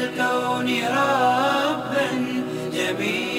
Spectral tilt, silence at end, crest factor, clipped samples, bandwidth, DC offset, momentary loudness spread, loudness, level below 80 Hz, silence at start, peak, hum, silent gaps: -4 dB/octave; 0 s; 14 dB; under 0.1%; 16 kHz; under 0.1%; 6 LU; -22 LUFS; -60 dBFS; 0 s; -8 dBFS; none; none